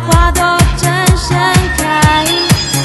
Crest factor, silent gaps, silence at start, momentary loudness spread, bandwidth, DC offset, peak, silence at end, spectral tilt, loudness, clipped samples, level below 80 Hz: 10 dB; none; 0 s; 2 LU; 12.5 kHz; under 0.1%; 0 dBFS; 0 s; -4 dB/octave; -10 LUFS; 0.4%; -18 dBFS